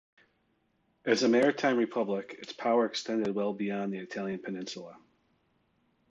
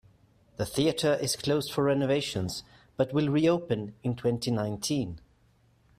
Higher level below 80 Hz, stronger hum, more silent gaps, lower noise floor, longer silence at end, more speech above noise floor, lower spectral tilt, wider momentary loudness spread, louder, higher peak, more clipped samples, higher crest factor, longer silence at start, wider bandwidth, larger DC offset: second, -78 dBFS vs -58 dBFS; neither; neither; first, -74 dBFS vs -64 dBFS; first, 1.15 s vs 0.8 s; first, 44 dB vs 37 dB; about the same, -5 dB/octave vs -5.5 dB/octave; first, 14 LU vs 11 LU; about the same, -30 LUFS vs -29 LUFS; about the same, -10 dBFS vs -12 dBFS; neither; about the same, 22 dB vs 18 dB; first, 1.05 s vs 0.6 s; second, 8.4 kHz vs 15.5 kHz; neither